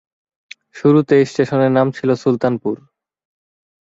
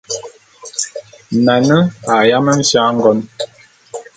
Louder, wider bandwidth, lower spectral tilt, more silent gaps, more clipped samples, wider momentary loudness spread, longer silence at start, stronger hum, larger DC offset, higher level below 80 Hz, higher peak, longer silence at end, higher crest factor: second, -16 LUFS vs -13 LUFS; second, 7.8 kHz vs 9.4 kHz; first, -7.5 dB/octave vs -4.5 dB/octave; neither; neither; second, 9 LU vs 15 LU; first, 0.75 s vs 0.1 s; neither; neither; about the same, -60 dBFS vs -56 dBFS; about the same, -2 dBFS vs 0 dBFS; first, 1.1 s vs 0.15 s; about the same, 16 dB vs 14 dB